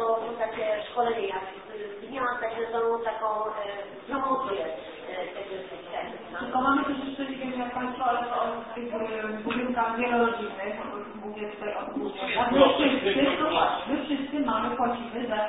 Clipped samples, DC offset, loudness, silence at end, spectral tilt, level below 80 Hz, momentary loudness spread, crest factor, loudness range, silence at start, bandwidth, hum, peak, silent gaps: under 0.1%; under 0.1%; -28 LUFS; 0 s; -8.5 dB/octave; -58 dBFS; 13 LU; 22 dB; 6 LU; 0 s; 4 kHz; none; -6 dBFS; none